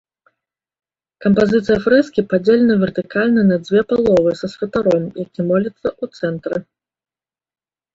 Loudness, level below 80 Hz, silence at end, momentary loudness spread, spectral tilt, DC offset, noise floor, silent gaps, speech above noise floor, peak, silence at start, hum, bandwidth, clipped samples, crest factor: -17 LUFS; -50 dBFS; 1.35 s; 10 LU; -8 dB/octave; under 0.1%; under -90 dBFS; none; over 74 dB; -2 dBFS; 1.2 s; none; 7.8 kHz; under 0.1%; 16 dB